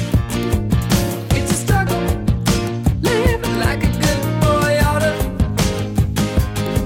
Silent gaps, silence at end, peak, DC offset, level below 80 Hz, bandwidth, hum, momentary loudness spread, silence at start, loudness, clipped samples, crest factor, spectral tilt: none; 0 s; -4 dBFS; under 0.1%; -24 dBFS; 17 kHz; none; 4 LU; 0 s; -18 LUFS; under 0.1%; 14 dB; -5.5 dB/octave